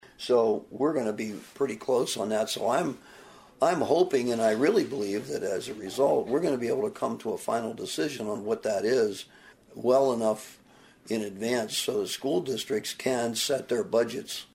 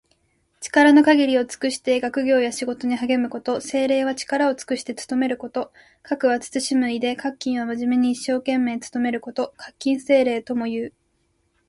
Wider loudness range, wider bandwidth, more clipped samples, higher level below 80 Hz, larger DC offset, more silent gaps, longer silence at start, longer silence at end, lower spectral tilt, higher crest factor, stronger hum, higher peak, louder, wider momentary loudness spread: about the same, 3 LU vs 5 LU; first, 16 kHz vs 11.5 kHz; neither; second, -70 dBFS vs -64 dBFS; neither; neither; second, 0.2 s vs 0.6 s; second, 0.1 s vs 0.8 s; about the same, -4 dB/octave vs -3.5 dB/octave; about the same, 18 dB vs 18 dB; neither; second, -10 dBFS vs -2 dBFS; second, -28 LUFS vs -21 LUFS; about the same, 9 LU vs 11 LU